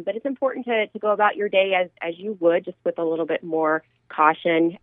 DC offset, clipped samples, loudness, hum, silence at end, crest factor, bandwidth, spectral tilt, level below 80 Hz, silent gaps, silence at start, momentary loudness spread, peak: under 0.1%; under 0.1%; -22 LUFS; none; 0.05 s; 20 dB; 3.9 kHz; -9 dB/octave; -76 dBFS; none; 0 s; 9 LU; -2 dBFS